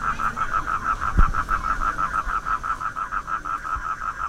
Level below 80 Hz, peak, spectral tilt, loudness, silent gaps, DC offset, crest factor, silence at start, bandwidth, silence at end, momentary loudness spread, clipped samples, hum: -28 dBFS; -4 dBFS; -5 dB/octave; -25 LUFS; none; under 0.1%; 20 dB; 0 s; 12 kHz; 0 s; 5 LU; under 0.1%; none